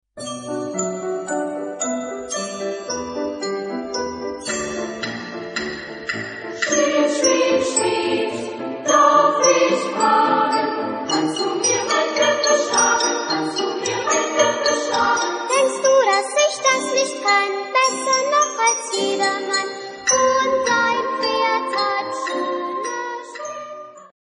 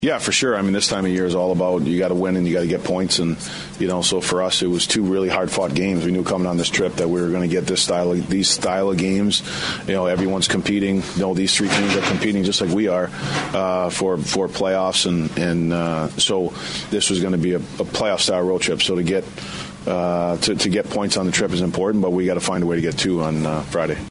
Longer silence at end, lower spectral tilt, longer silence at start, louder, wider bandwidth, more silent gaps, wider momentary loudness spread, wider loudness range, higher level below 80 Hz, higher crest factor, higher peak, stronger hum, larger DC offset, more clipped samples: first, 0.15 s vs 0 s; second, -1.5 dB/octave vs -4 dB/octave; first, 0.15 s vs 0 s; about the same, -19 LUFS vs -20 LUFS; about the same, 10.5 kHz vs 11 kHz; neither; first, 11 LU vs 5 LU; first, 9 LU vs 1 LU; second, -60 dBFS vs -48 dBFS; about the same, 18 dB vs 16 dB; about the same, -2 dBFS vs -4 dBFS; neither; neither; neither